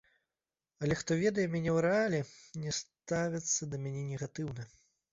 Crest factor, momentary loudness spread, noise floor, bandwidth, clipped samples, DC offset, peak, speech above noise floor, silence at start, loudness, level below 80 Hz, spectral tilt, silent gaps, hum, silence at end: 18 dB; 12 LU; under -90 dBFS; 7.8 kHz; under 0.1%; under 0.1%; -18 dBFS; over 56 dB; 0.8 s; -34 LUFS; -64 dBFS; -5 dB/octave; none; none; 0.45 s